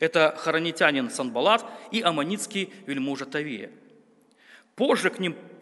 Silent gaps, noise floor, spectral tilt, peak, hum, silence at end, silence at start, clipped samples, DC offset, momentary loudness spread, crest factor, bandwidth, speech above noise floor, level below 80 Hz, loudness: none; -59 dBFS; -4 dB/octave; -2 dBFS; none; 0.05 s; 0 s; under 0.1%; under 0.1%; 9 LU; 24 dB; 11.5 kHz; 33 dB; -78 dBFS; -25 LUFS